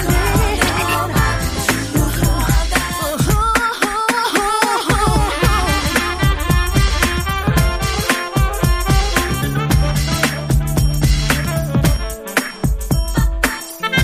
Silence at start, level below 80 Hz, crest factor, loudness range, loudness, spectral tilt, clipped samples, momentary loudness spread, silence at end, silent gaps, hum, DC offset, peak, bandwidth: 0 s; -20 dBFS; 16 dB; 2 LU; -17 LUFS; -4.5 dB/octave; under 0.1%; 4 LU; 0 s; none; none; under 0.1%; 0 dBFS; 15.5 kHz